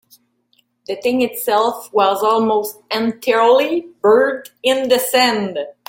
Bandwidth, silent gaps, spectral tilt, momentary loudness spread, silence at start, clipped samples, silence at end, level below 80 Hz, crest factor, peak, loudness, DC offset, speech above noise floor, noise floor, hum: 17 kHz; none; -3 dB/octave; 8 LU; 0.9 s; under 0.1%; 0.15 s; -64 dBFS; 16 dB; -2 dBFS; -16 LUFS; under 0.1%; 46 dB; -62 dBFS; none